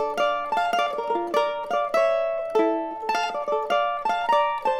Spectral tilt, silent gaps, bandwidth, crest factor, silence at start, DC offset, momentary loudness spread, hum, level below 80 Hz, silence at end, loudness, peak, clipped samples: -3 dB/octave; none; 16.5 kHz; 16 dB; 0 s; under 0.1%; 4 LU; none; -62 dBFS; 0 s; -24 LUFS; -8 dBFS; under 0.1%